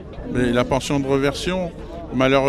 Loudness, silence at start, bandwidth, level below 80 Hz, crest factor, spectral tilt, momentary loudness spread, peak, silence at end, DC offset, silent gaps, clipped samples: -21 LUFS; 0 s; 13.5 kHz; -38 dBFS; 16 dB; -5.5 dB/octave; 9 LU; -4 dBFS; 0 s; under 0.1%; none; under 0.1%